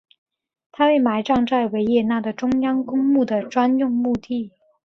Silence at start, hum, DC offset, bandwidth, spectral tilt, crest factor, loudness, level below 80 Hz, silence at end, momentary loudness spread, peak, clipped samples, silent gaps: 0.8 s; none; under 0.1%; 6.6 kHz; -6.5 dB/octave; 14 dB; -20 LUFS; -56 dBFS; 0.4 s; 5 LU; -6 dBFS; under 0.1%; none